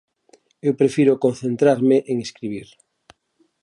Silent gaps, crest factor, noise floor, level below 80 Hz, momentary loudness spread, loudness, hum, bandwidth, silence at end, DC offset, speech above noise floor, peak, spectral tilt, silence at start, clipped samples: none; 16 dB; -65 dBFS; -66 dBFS; 14 LU; -19 LUFS; none; 11.5 kHz; 1 s; under 0.1%; 46 dB; -4 dBFS; -7 dB/octave; 0.65 s; under 0.1%